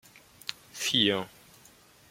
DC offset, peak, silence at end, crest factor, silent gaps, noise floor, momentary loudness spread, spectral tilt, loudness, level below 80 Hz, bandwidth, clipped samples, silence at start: under 0.1%; -8 dBFS; 0.85 s; 26 dB; none; -57 dBFS; 16 LU; -2.5 dB/octave; -28 LUFS; -70 dBFS; 16.5 kHz; under 0.1%; 0.5 s